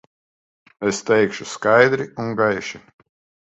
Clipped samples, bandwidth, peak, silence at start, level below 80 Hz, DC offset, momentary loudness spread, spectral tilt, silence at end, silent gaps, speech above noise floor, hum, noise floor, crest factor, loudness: under 0.1%; 8.2 kHz; 0 dBFS; 0.8 s; -60 dBFS; under 0.1%; 12 LU; -4.5 dB/octave; 0.75 s; none; over 71 dB; none; under -90 dBFS; 20 dB; -19 LUFS